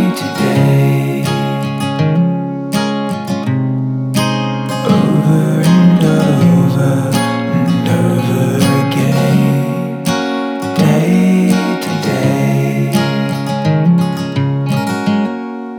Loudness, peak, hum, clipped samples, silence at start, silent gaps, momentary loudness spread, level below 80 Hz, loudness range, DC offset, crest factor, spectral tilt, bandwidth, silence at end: -13 LUFS; 0 dBFS; none; under 0.1%; 0 s; none; 7 LU; -52 dBFS; 4 LU; under 0.1%; 12 dB; -6.5 dB/octave; 18 kHz; 0 s